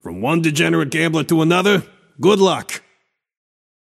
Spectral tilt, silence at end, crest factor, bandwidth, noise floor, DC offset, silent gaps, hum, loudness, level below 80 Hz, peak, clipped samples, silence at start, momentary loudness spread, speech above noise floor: -5 dB/octave; 1.05 s; 16 dB; 15 kHz; -64 dBFS; under 0.1%; none; none; -16 LUFS; -60 dBFS; -2 dBFS; under 0.1%; 0.05 s; 7 LU; 48 dB